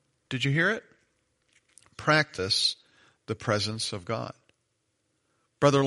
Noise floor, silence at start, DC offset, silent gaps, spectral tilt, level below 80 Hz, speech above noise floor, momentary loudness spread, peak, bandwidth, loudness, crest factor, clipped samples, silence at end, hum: -76 dBFS; 0.3 s; under 0.1%; none; -4 dB/octave; -66 dBFS; 49 dB; 12 LU; -6 dBFS; 11.5 kHz; -27 LUFS; 24 dB; under 0.1%; 0 s; none